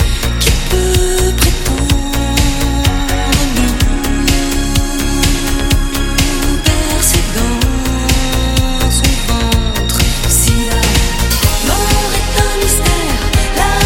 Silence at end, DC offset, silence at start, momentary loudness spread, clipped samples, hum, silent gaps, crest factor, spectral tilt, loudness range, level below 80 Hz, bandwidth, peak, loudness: 0 s; under 0.1%; 0 s; 3 LU; under 0.1%; none; none; 12 dB; -3.5 dB/octave; 2 LU; -16 dBFS; 17.5 kHz; 0 dBFS; -13 LUFS